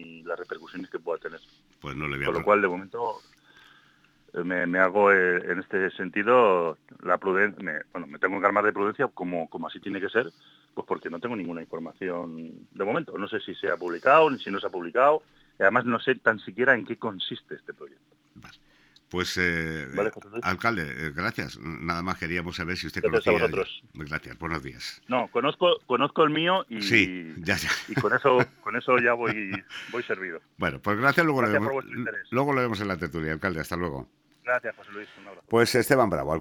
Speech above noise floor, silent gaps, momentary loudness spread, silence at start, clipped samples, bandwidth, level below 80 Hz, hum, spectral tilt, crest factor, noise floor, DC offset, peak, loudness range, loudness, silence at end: 35 dB; none; 15 LU; 0 s; under 0.1%; 19 kHz; -56 dBFS; none; -5 dB/octave; 22 dB; -61 dBFS; under 0.1%; -4 dBFS; 7 LU; -26 LUFS; 0 s